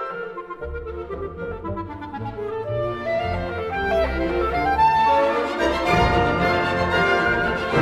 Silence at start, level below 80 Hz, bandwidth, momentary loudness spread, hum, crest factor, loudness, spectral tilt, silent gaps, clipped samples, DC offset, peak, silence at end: 0 s; -36 dBFS; 15 kHz; 14 LU; none; 16 dB; -22 LUFS; -6 dB/octave; none; under 0.1%; under 0.1%; -6 dBFS; 0 s